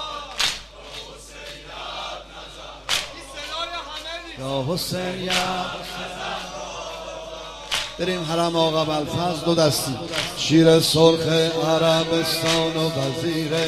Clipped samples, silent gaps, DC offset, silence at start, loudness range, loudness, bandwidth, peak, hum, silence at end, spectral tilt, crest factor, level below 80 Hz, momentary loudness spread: under 0.1%; none; under 0.1%; 0 s; 11 LU; -22 LUFS; 15 kHz; -2 dBFS; none; 0 s; -4 dB/octave; 22 dB; -48 dBFS; 19 LU